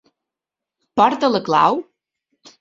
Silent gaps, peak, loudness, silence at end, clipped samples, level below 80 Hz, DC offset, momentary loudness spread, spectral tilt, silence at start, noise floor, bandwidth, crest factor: none; -2 dBFS; -17 LUFS; 0.8 s; under 0.1%; -62 dBFS; under 0.1%; 10 LU; -5.5 dB/octave; 0.95 s; -86 dBFS; 7.6 kHz; 18 dB